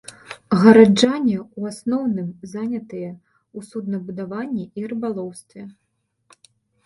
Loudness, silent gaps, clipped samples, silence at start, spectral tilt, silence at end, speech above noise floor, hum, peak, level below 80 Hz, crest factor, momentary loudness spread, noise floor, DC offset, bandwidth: -19 LUFS; none; under 0.1%; 0.3 s; -6 dB/octave; 1.15 s; 53 dB; none; 0 dBFS; -62 dBFS; 20 dB; 26 LU; -72 dBFS; under 0.1%; 11.5 kHz